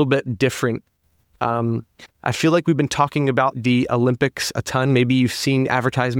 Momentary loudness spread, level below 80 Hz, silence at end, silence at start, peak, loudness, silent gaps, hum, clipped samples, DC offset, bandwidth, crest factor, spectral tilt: 7 LU; -52 dBFS; 0 s; 0 s; -2 dBFS; -20 LUFS; none; none; under 0.1%; under 0.1%; 16.5 kHz; 18 dB; -5.5 dB/octave